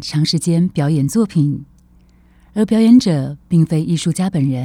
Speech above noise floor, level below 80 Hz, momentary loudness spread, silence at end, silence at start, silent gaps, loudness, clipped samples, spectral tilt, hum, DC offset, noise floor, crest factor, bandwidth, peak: 34 dB; -48 dBFS; 9 LU; 0 s; 0 s; none; -15 LUFS; under 0.1%; -6.5 dB/octave; none; under 0.1%; -49 dBFS; 14 dB; 15.5 kHz; -2 dBFS